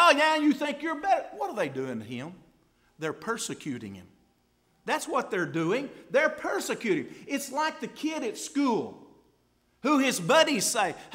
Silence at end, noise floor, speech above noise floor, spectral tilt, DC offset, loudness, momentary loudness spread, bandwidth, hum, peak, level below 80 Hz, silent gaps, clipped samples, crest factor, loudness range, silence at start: 0 s; -68 dBFS; 40 dB; -3.5 dB/octave; under 0.1%; -28 LUFS; 14 LU; 16 kHz; none; -6 dBFS; -72 dBFS; none; under 0.1%; 22 dB; 8 LU; 0 s